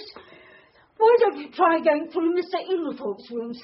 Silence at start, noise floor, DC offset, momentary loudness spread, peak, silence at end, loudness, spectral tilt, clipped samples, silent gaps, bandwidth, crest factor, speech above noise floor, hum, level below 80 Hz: 0 s; -54 dBFS; under 0.1%; 14 LU; -6 dBFS; 0 s; -23 LUFS; -2 dB/octave; under 0.1%; none; 5.8 kHz; 16 dB; 31 dB; none; -72 dBFS